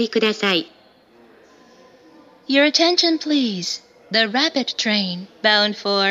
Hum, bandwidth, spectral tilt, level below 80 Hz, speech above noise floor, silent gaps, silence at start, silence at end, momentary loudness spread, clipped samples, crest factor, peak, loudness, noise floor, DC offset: none; 13.5 kHz; -3 dB/octave; -76 dBFS; 33 dB; none; 0 s; 0 s; 10 LU; under 0.1%; 20 dB; 0 dBFS; -18 LUFS; -52 dBFS; under 0.1%